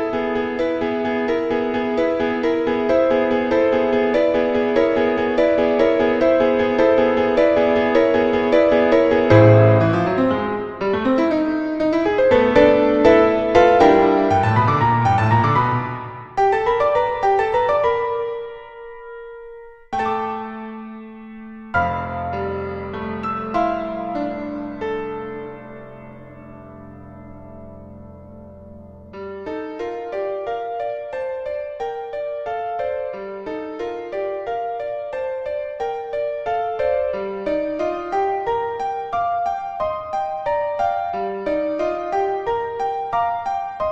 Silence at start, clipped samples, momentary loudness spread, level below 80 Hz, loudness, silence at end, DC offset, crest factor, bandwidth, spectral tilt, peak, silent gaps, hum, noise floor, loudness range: 0 s; under 0.1%; 19 LU; -46 dBFS; -19 LUFS; 0 s; under 0.1%; 18 dB; 8 kHz; -8 dB/octave; 0 dBFS; none; none; -40 dBFS; 14 LU